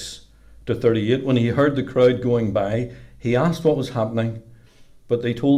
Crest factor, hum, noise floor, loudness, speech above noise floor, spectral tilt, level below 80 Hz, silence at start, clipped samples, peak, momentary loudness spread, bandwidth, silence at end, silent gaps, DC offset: 14 dB; none; -48 dBFS; -21 LUFS; 28 dB; -7.5 dB/octave; -50 dBFS; 0 s; under 0.1%; -6 dBFS; 13 LU; 14 kHz; 0 s; none; under 0.1%